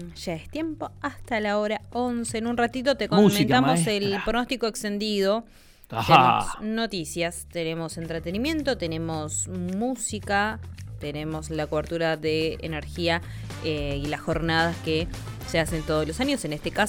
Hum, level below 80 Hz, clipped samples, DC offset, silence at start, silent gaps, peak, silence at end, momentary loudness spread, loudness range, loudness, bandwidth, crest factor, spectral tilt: none; -44 dBFS; under 0.1%; under 0.1%; 0 s; none; -2 dBFS; 0 s; 12 LU; 6 LU; -26 LUFS; 18 kHz; 22 dB; -4.5 dB/octave